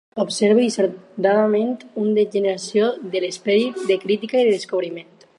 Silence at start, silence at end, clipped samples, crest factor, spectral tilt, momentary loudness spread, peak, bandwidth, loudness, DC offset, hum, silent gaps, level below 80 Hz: 0.15 s; 0.35 s; under 0.1%; 16 dB; -5 dB/octave; 8 LU; -4 dBFS; 11.5 kHz; -20 LUFS; under 0.1%; none; none; -74 dBFS